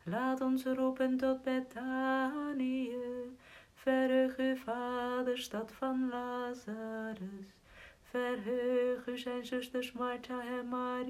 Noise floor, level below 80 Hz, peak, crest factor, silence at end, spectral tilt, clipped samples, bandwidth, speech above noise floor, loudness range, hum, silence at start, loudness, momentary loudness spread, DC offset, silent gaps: -58 dBFS; -70 dBFS; -20 dBFS; 16 dB; 0 s; -5.5 dB/octave; under 0.1%; 14.5 kHz; 22 dB; 4 LU; none; 0.05 s; -36 LUFS; 10 LU; under 0.1%; none